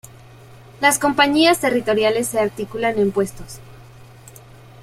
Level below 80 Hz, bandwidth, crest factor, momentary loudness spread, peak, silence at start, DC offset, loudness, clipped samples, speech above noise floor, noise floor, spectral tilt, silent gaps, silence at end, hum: -50 dBFS; 16 kHz; 20 dB; 12 LU; -2 dBFS; 0.5 s; under 0.1%; -18 LUFS; under 0.1%; 25 dB; -43 dBFS; -3.5 dB/octave; none; 1 s; none